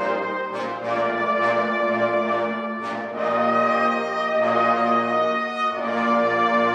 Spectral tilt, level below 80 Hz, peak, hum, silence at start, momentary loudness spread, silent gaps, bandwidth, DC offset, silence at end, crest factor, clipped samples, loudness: -5.5 dB/octave; -68 dBFS; -8 dBFS; none; 0 s; 8 LU; none; 9 kHz; under 0.1%; 0 s; 14 dB; under 0.1%; -22 LUFS